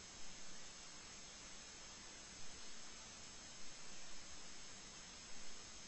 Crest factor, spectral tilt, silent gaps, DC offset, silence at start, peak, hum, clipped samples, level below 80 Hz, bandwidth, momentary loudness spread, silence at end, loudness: 14 dB; -1 dB/octave; none; under 0.1%; 0 s; -38 dBFS; none; under 0.1%; -68 dBFS; 8.2 kHz; 0 LU; 0 s; -54 LUFS